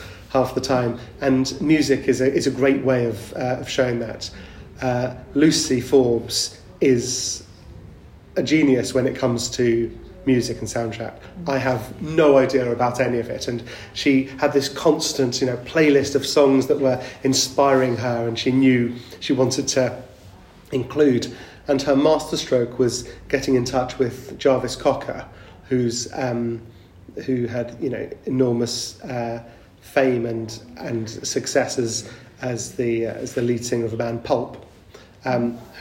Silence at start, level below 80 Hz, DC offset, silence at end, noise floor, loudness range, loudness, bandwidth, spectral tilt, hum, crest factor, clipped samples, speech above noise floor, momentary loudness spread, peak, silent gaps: 0 s; -50 dBFS; under 0.1%; 0 s; -46 dBFS; 6 LU; -21 LUFS; 16 kHz; -5 dB/octave; none; 18 dB; under 0.1%; 26 dB; 12 LU; -2 dBFS; none